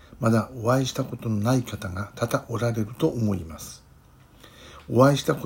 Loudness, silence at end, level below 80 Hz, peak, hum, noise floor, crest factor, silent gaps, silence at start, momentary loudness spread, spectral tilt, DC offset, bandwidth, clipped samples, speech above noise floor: -25 LUFS; 0 s; -54 dBFS; -2 dBFS; none; -53 dBFS; 22 dB; none; 0.1 s; 17 LU; -6.5 dB/octave; under 0.1%; 16.5 kHz; under 0.1%; 29 dB